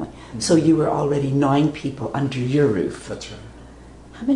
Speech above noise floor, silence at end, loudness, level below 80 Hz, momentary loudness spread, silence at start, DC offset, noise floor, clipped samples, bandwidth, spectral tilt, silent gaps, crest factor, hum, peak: 22 dB; 0 s; -20 LUFS; -46 dBFS; 16 LU; 0 s; under 0.1%; -42 dBFS; under 0.1%; 11 kHz; -6.5 dB/octave; none; 16 dB; none; -4 dBFS